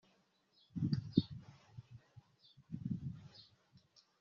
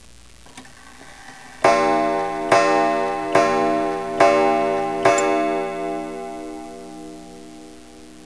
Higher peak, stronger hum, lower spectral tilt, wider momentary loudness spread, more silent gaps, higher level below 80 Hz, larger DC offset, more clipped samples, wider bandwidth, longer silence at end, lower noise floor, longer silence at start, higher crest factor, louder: second, -14 dBFS vs -2 dBFS; second, none vs 60 Hz at -40 dBFS; first, -8.5 dB/octave vs -4 dB/octave; about the same, 23 LU vs 23 LU; neither; second, -70 dBFS vs -54 dBFS; second, under 0.1% vs 0.4%; neither; second, 7 kHz vs 11 kHz; first, 0.45 s vs 0 s; first, -75 dBFS vs -46 dBFS; first, 0.75 s vs 0.55 s; first, 30 dB vs 20 dB; second, -41 LUFS vs -19 LUFS